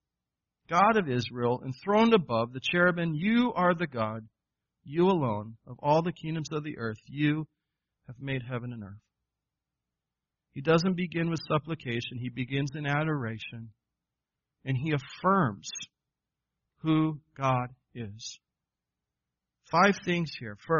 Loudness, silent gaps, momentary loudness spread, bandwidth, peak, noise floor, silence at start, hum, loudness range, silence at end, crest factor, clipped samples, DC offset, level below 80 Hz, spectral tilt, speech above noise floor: -29 LUFS; none; 17 LU; 7 kHz; -10 dBFS; -89 dBFS; 0.7 s; none; 8 LU; 0 s; 20 dB; under 0.1%; under 0.1%; -64 dBFS; -5 dB/octave; 60 dB